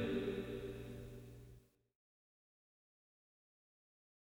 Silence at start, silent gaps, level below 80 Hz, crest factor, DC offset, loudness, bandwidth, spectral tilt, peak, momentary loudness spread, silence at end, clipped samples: 0 s; none; -64 dBFS; 20 dB; under 0.1%; -46 LUFS; over 20 kHz; -7 dB/octave; -28 dBFS; 20 LU; 2.75 s; under 0.1%